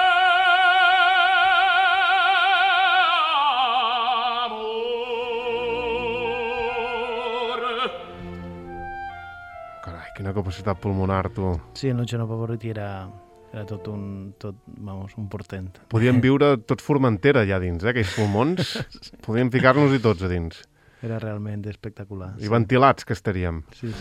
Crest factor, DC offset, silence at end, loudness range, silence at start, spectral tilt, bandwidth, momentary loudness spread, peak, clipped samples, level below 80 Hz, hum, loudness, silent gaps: 20 dB; under 0.1%; 0 s; 13 LU; 0 s; -6 dB/octave; 13.5 kHz; 19 LU; -2 dBFS; under 0.1%; -52 dBFS; none; -21 LUFS; none